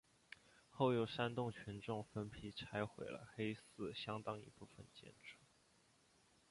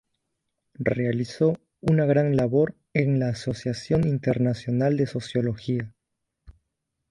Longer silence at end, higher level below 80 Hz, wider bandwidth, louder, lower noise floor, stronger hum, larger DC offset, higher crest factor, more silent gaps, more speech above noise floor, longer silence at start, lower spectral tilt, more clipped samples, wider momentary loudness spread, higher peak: first, 1.15 s vs 0.6 s; second, -74 dBFS vs -52 dBFS; about the same, 11.5 kHz vs 11 kHz; second, -45 LUFS vs -25 LUFS; second, -74 dBFS vs -81 dBFS; neither; neither; first, 24 dB vs 18 dB; neither; second, 29 dB vs 58 dB; about the same, 0.7 s vs 0.8 s; second, -6.5 dB/octave vs -8 dB/octave; neither; first, 21 LU vs 8 LU; second, -24 dBFS vs -6 dBFS